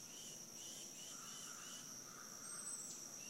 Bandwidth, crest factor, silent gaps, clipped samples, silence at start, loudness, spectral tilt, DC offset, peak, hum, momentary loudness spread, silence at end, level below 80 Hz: 16 kHz; 16 dB; none; under 0.1%; 0 s; -50 LUFS; -0.5 dB/octave; under 0.1%; -36 dBFS; none; 4 LU; 0 s; -84 dBFS